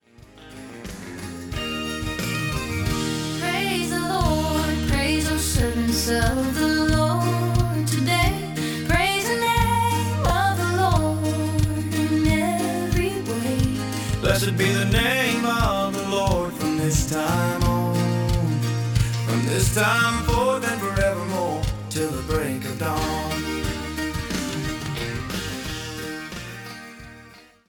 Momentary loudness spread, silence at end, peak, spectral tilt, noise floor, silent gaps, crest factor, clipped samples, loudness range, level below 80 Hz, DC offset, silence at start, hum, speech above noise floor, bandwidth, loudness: 10 LU; 0.3 s; -6 dBFS; -5 dB/octave; -48 dBFS; none; 16 dB; under 0.1%; 6 LU; -34 dBFS; under 0.1%; 0.2 s; none; 28 dB; 18 kHz; -23 LUFS